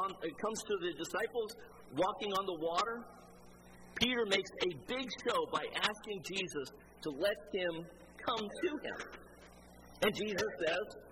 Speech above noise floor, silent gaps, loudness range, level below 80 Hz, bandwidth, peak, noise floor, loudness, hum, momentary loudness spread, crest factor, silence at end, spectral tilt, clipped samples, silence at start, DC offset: 20 dB; none; 3 LU; -66 dBFS; 16 kHz; -16 dBFS; -57 dBFS; -37 LUFS; none; 15 LU; 24 dB; 0 s; -3.5 dB/octave; under 0.1%; 0 s; under 0.1%